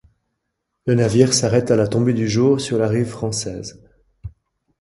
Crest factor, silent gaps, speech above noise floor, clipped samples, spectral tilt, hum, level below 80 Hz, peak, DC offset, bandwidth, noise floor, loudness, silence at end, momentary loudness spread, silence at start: 20 dB; none; 59 dB; under 0.1%; -5.5 dB/octave; none; -48 dBFS; 0 dBFS; under 0.1%; 11.5 kHz; -76 dBFS; -18 LUFS; 0.55 s; 22 LU; 0.85 s